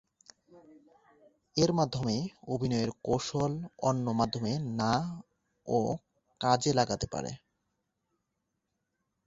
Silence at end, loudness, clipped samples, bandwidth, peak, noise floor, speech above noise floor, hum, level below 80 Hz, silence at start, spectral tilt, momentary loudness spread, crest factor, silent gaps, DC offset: 1.9 s; -31 LUFS; under 0.1%; 8 kHz; -10 dBFS; -83 dBFS; 52 dB; none; -58 dBFS; 0.55 s; -5.5 dB/octave; 11 LU; 22 dB; none; under 0.1%